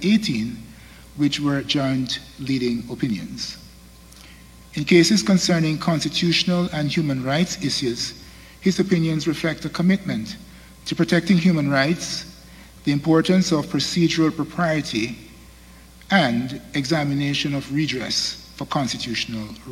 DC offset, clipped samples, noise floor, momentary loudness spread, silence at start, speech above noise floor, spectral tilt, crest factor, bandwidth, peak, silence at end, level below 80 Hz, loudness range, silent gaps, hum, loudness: under 0.1%; under 0.1%; -45 dBFS; 12 LU; 0 s; 25 dB; -5 dB/octave; 20 dB; 16 kHz; -2 dBFS; 0 s; -50 dBFS; 4 LU; none; none; -21 LUFS